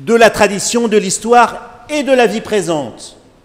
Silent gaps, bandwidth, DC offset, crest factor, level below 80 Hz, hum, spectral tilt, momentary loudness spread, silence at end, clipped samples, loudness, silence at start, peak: none; 16.5 kHz; under 0.1%; 14 dB; -46 dBFS; none; -3.5 dB/octave; 12 LU; 0.35 s; 0.3%; -12 LUFS; 0 s; 0 dBFS